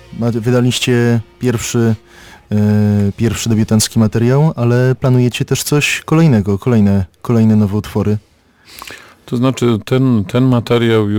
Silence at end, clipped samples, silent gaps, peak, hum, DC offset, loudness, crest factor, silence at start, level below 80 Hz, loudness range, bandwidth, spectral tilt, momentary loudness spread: 0 s; under 0.1%; none; -2 dBFS; none; under 0.1%; -14 LUFS; 10 dB; 0.1 s; -42 dBFS; 3 LU; 19 kHz; -6 dB/octave; 6 LU